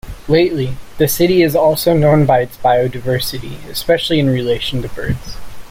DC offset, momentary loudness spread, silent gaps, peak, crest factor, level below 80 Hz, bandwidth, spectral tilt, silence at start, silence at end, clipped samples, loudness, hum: under 0.1%; 12 LU; none; -2 dBFS; 14 dB; -34 dBFS; 16.5 kHz; -5.5 dB/octave; 0.05 s; 0.05 s; under 0.1%; -15 LUFS; none